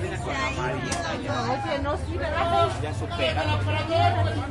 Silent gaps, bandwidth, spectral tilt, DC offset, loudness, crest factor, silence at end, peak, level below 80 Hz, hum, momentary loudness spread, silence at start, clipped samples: none; 11.5 kHz; -5.5 dB/octave; under 0.1%; -26 LUFS; 16 dB; 0 s; -8 dBFS; -40 dBFS; none; 6 LU; 0 s; under 0.1%